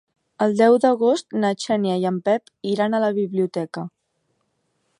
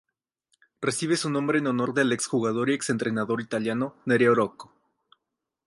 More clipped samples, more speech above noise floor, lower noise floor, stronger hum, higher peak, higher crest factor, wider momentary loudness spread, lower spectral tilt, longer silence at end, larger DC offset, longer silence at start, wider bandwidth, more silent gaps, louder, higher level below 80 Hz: neither; second, 51 dB vs 59 dB; second, -71 dBFS vs -84 dBFS; neither; first, -4 dBFS vs -8 dBFS; about the same, 18 dB vs 18 dB; first, 11 LU vs 7 LU; about the same, -6 dB/octave vs -5 dB/octave; about the same, 1.1 s vs 1 s; neither; second, 0.4 s vs 0.8 s; about the same, 11 kHz vs 11.5 kHz; neither; first, -21 LUFS vs -25 LUFS; about the same, -70 dBFS vs -70 dBFS